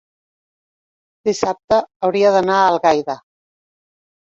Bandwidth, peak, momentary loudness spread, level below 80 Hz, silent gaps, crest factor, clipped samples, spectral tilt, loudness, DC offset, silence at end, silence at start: 7.8 kHz; 0 dBFS; 10 LU; -56 dBFS; 1.64-1.68 s, 1.96-2.00 s; 18 dB; under 0.1%; -4.5 dB/octave; -16 LUFS; under 0.1%; 1.05 s; 1.25 s